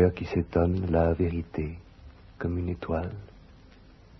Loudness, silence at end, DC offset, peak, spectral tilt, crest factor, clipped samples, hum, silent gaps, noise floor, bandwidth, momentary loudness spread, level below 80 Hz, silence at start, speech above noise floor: -29 LUFS; 0.8 s; under 0.1%; -10 dBFS; -10 dB/octave; 18 dB; under 0.1%; none; none; -53 dBFS; 6 kHz; 13 LU; -42 dBFS; 0 s; 25 dB